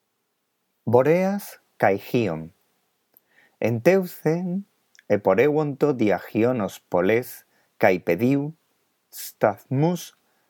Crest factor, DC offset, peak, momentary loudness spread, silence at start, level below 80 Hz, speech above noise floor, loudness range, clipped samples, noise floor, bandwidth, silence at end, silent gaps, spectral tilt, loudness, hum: 22 dB; under 0.1%; -2 dBFS; 16 LU; 0.85 s; -68 dBFS; 53 dB; 3 LU; under 0.1%; -75 dBFS; 19 kHz; 0.4 s; none; -7 dB/octave; -23 LUFS; none